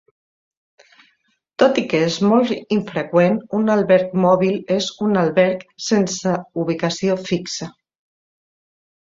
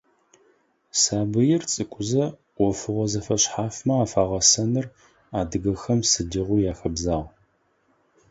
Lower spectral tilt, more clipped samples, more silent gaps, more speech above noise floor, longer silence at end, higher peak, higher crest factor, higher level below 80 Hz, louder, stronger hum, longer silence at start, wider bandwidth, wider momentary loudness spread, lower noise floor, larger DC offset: first, -5.5 dB/octave vs -4 dB/octave; neither; neither; first, 47 dB vs 43 dB; first, 1.4 s vs 1.05 s; about the same, -2 dBFS vs -4 dBFS; about the same, 18 dB vs 22 dB; second, -60 dBFS vs -44 dBFS; first, -18 LUFS vs -23 LUFS; neither; first, 1.6 s vs 0.95 s; about the same, 7.8 kHz vs 8 kHz; about the same, 8 LU vs 9 LU; about the same, -65 dBFS vs -66 dBFS; neither